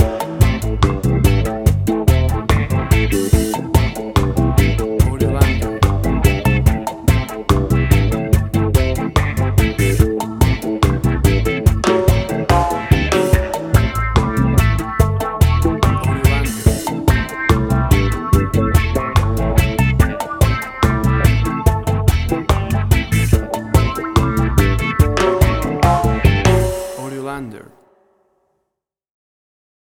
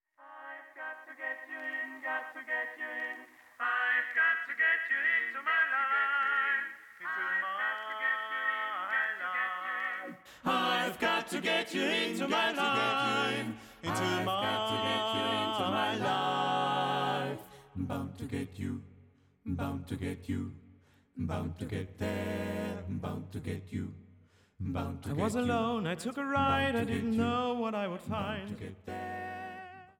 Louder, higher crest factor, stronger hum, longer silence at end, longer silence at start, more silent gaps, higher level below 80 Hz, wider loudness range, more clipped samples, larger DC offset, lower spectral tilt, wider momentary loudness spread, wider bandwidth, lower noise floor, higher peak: first, -16 LUFS vs -32 LUFS; about the same, 14 dB vs 14 dB; neither; first, 2.4 s vs 0.1 s; second, 0 s vs 0.2 s; neither; first, -20 dBFS vs -62 dBFS; second, 1 LU vs 9 LU; neither; neither; first, -6.5 dB/octave vs -4.5 dB/octave; second, 3 LU vs 13 LU; first, 19 kHz vs 17 kHz; first, -79 dBFS vs -62 dBFS; first, 0 dBFS vs -20 dBFS